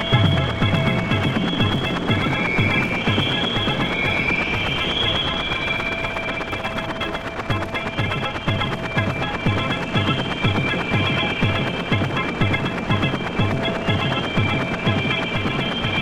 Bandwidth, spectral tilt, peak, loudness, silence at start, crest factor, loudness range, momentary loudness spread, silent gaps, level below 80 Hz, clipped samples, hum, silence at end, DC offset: 13 kHz; -6 dB/octave; -4 dBFS; -21 LUFS; 0 s; 16 dB; 4 LU; 5 LU; none; -38 dBFS; under 0.1%; none; 0 s; under 0.1%